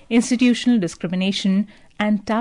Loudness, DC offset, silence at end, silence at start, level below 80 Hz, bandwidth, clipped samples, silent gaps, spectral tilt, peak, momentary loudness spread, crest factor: -20 LUFS; under 0.1%; 0 s; 0.1 s; -56 dBFS; 11 kHz; under 0.1%; none; -5 dB/octave; -8 dBFS; 8 LU; 12 dB